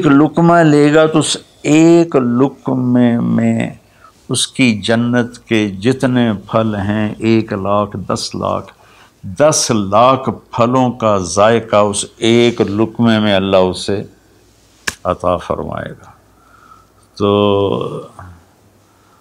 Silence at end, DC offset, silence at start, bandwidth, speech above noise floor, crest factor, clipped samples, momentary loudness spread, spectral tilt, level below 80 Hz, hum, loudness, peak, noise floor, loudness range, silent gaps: 0.85 s; under 0.1%; 0 s; 14.5 kHz; 37 dB; 14 dB; under 0.1%; 11 LU; -5 dB/octave; -48 dBFS; none; -13 LUFS; 0 dBFS; -49 dBFS; 7 LU; none